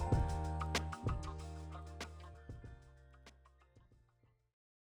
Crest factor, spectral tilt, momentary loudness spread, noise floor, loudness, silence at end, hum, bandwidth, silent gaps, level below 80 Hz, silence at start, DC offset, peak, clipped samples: 18 dB; -5.5 dB/octave; 24 LU; -74 dBFS; -43 LUFS; 1.15 s; none; 13.5 kHz; none; -48 dBFS; 0 s; under 0.1%; -24 dBFS; under 0.1%